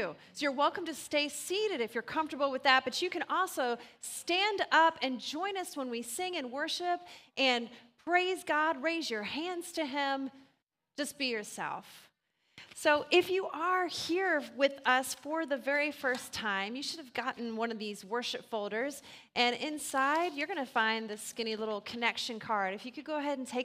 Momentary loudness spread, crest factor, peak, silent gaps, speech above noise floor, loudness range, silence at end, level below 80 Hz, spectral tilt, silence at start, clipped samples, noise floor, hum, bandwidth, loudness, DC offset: 11 LU; 24 dB; -10 dBFS; none; 43 dB; 5 LU; 0 s; -80 dBFS; -2 dB/octave; 0 s; under 0.1%; -76 dBFS; none; 15.5 kHz; -33 LUFS; under 0.1%